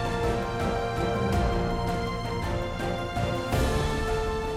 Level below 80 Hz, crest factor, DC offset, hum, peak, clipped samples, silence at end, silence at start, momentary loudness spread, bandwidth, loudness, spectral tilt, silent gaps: -34 dBFS; 12 dB; under 0.1%; none; -14 dBFS; under 0.1%; 0 s; 0 s; 4 LU; 16 kHz; -28 LUFS; -6 dB/octave; none